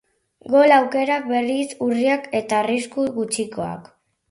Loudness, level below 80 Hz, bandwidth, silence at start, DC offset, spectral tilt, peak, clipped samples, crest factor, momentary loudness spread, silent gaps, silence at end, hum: -20 LUFS; -64 dBFS; 11.5 kHz; 0.45 s; under 0.1%; -4 dB/octave; -2 dBFS; under 0.1%; 18 dB; 12 LU; none; 0.5 s; none